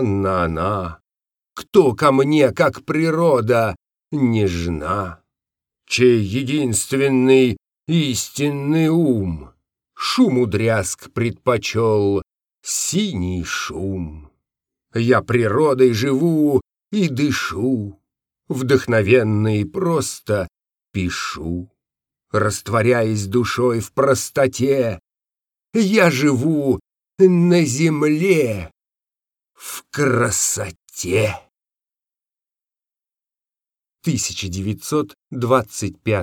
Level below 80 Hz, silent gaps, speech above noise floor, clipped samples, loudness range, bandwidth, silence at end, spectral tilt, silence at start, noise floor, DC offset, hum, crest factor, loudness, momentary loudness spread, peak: -50 dBFS; none; over 72 dB; under 0.1%; 6 LU; 18.5 kHz; 0 s; -5.5 dB/octave; 0 s; under -90 dBFS; under 0.1%; none; 18 dB; -18 LUFS; 12 LU; -2 dBFS